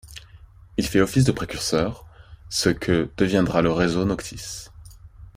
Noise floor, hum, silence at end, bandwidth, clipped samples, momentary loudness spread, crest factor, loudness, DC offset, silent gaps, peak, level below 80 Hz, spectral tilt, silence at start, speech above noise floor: -47 dBFS; none; 0.05 s; 16 kHz; under 0.1%; 16 LU; 20 dB; -22 LUFS; under 0.1%; none; -4 dBFS; -42 dBFS; -5 dB/octave; 0.05 s; 26 dB